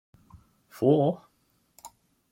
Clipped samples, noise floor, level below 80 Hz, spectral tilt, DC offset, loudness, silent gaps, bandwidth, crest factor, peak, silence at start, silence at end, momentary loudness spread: under 0.1%; -70 dBFS; -68 dBFS; -8.5 dB/octave; under 0.1%; -25 LUFS; none; 16.5 kHz; 22 dB; -8 dBFS; 0.8 s; 0.45 s; 27 LU